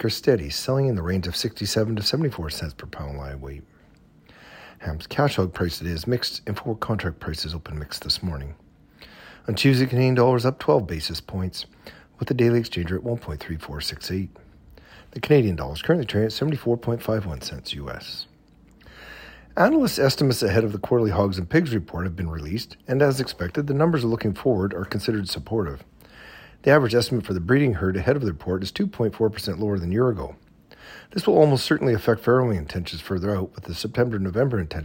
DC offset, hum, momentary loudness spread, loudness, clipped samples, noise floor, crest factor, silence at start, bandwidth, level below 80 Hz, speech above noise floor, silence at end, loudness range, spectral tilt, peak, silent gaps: under 0.1%; none; 15 LU; -23 LUFS; under 0.1%; -54 dBFS; 20 dB; 0 s; 16.5 kHz; -44 dBFS; 31 dB; 0 s; 6 LU; -6 dB/octave; -4 dBFS; none